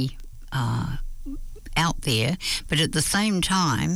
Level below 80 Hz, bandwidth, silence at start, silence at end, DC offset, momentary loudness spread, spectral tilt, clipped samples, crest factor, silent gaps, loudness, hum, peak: -36 dBFS; 19.5 kHz; 0 s; 0 s; under 0.1%; 16 LU; -4 dB/octave; under 0.1%; 14 dB; none; -24 LUFS; none; -10 dBFS